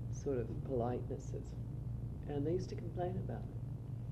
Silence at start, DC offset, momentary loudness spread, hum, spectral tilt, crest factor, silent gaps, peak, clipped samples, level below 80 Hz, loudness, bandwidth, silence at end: 0 s; under 0.1%; 7 LU; none; -8.5 dB/octave; 16 dB; none; -24 dBFS; under 0.1%; -50 dBFS; -41 LUFS; 8.2 kHz; 0 s